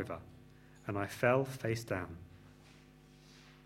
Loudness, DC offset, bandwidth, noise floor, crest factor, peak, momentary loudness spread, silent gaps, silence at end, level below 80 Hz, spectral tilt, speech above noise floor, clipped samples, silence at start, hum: -36 LUFS; under 0.1%; 16 kHz; -60 dBFS; 24 dB; -14 dBFS; 27 LU; none; 0.05 s; -66 dBFS; -6 dB/octave; 24 dB; under 0.1%; 0 s; 50 Hz at -60 dBFS